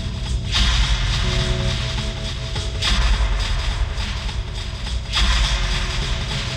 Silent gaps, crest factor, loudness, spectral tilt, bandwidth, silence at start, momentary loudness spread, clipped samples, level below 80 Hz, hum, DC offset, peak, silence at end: none; 16 dB; -22 LUFS; -3.5 dB/octave; 10.5 kHz; 0 s; 8 LU; under 0.1%; -22 dBFS; none; under 0.1%; -6 dBFS; 0 s